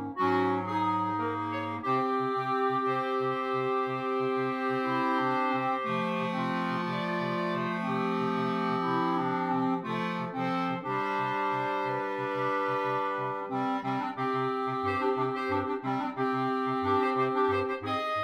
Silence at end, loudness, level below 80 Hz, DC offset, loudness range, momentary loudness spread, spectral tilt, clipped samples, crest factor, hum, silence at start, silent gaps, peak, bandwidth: 0 s; -30 LUFS; -76 dBFS; under 0.1%; 1 LU; 4 LU; -7 dB/octave; under 0.1%; 16 dB; none; 0 s; none; -14 dBFS; 11 kHz